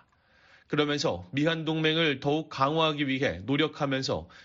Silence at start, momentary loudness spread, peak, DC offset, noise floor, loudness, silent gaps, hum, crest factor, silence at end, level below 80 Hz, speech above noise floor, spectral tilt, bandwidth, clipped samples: 0.7 s; 5 LU; -10 dBFS; under 0.1%; -62 dBFS; -28 LUFS; none; none; 18 dB; 0.05 s; -60 dBFS; 35 dB; -3.5 dB/octave; 7.6 kHz; under 0.1%